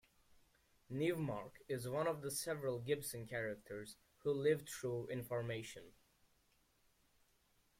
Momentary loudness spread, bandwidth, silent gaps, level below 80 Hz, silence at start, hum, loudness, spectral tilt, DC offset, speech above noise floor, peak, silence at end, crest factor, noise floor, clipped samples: 11 LU; 16.5 kHz; none; -74 dBFS; 0.9 s; none; -42 LUFS; -5 dB/octave; under 0.1%; 35 dB; -24 dBFS; 1.9 s; 20 dB; -77 dBFS; under 0.1%